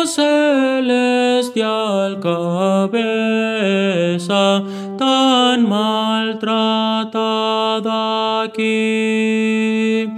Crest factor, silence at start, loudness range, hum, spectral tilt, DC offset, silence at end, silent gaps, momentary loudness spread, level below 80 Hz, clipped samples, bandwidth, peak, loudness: 16 dB; 0 s; 2 LU; none; -4.5 dB/octave; under 0.1%; 0 s; none; 5 LU; -72 dBFS; under 0.1%; 13 kHz; 0 dBFS; -16 LUFS